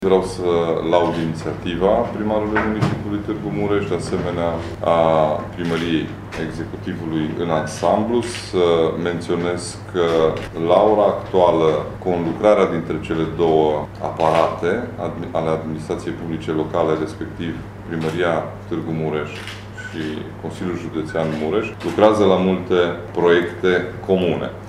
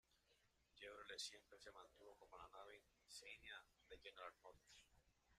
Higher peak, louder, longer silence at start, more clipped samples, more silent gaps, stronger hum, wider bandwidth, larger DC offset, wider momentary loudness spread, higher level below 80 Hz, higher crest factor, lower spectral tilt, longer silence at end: first, 0 dBFS vs -40 dBFS; first, -20 LUFS vs -60 LUFS; about the same, 0 s vs 0.1 s; neither; neither; neither; about the same, 12.5 kHz vs 13.5 kHz; neither; second, 11 LU vs 15 LU; first, -44 dBFS vs -82 dBFS; about the same, 20 dB vs 22 dB; first, -6.5 dB/octave vs -0.5 dB/octave; about the same, 0 s vs 0 s